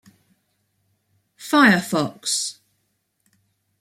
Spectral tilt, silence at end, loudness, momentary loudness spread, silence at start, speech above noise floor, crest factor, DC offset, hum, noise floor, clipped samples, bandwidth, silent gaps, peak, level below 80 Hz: -3.5 dB/octave; 1.3 s; -19 LUFS; 13 LU; 1.4 s; 53 dB; 20 dB; under 0.1%; none; -72 dBFS; under 0.1%; 16 kHz; none; -4 dBFS; -68 dBFS